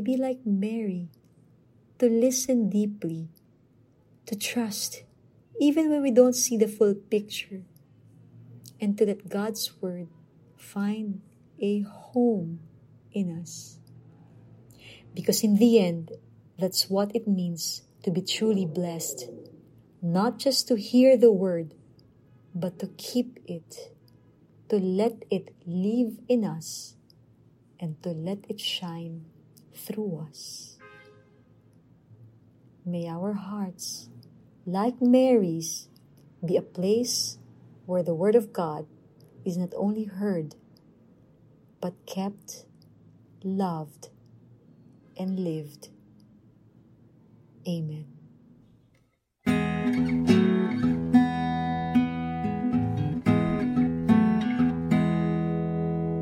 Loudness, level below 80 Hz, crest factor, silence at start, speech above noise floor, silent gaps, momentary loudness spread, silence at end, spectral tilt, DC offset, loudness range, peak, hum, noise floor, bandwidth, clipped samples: -26 LUFS; -58 dBFS; 22 dB; 0 s; 42 dB; none; 19 LU; 0 s; -5.5 dB/octave; under 0.1%; 12 LU; -6 dBFS; none; -68 dBFS; 16 kHz; under 0.1%